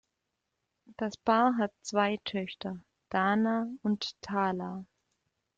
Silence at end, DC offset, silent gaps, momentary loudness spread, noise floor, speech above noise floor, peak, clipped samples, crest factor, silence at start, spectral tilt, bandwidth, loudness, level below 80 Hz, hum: 0.75 s; under 0.1%; none; 14 LU; -84 dBFS; 54 dB; -12 dBFS; under 0.1%; 20 dB; 0.9 s; -5.5 dB/octave; 7.8 kHz; -31 LUFS; -70 dBFS; none